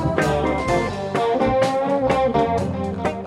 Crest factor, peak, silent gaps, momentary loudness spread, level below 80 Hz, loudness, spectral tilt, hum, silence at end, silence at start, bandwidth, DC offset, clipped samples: 18 dB; -2 dBFS; none; 5 LU; -38 dBFS; -20 LUFS; -6.5 dB/octave; none; 0 s; 0 s; 12.5 kHz; under 0.1%; under 0.1%